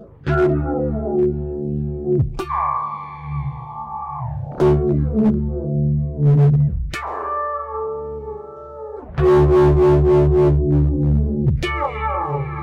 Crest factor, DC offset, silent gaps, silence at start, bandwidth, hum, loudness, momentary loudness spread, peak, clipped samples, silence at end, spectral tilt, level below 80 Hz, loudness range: 10 dB; under 0.1%; none; 0 s; 7 kHz; none; -19 LUFS; 15 LU; -8 dBFS; under 0.1%; 0 s; -9.5 dB/octave; -26 dBFS; 7 LU